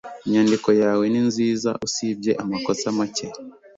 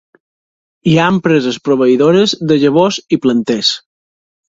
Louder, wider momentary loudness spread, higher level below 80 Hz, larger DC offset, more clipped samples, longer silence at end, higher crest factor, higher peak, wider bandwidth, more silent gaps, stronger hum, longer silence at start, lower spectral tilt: second, -21 LUFS vs -12 LUFS; first, 8 LU vs 5 LU; second, -62 dBFS vs -52 dBFS; neither; neither; second, 0.25 s vs 0.7 s; about the same, 16 dB vs 14 dB; second, -4 dBFS vs 0 dBFS; about the same, 8 kHz vs 7.8 kHz; neither; neither; second, 0.05 s vs 0.85 s; about the same, -5 dB/octave vs -5.5 dB/octave